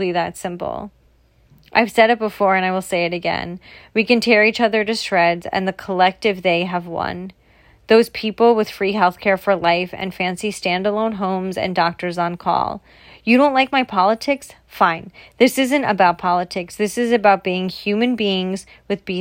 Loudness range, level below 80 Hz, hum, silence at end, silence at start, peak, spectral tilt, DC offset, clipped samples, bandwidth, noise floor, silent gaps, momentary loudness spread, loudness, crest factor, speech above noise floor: 3 LU; -54 dBFS; none; 0 s; 0 s; 0 dBFS; -5 dB/octave; under 0.1%; under 0.1%; 16.5 kHz; -55 dBFS; none; 11 LU; -18 LUFS; 18 dB; 37 dB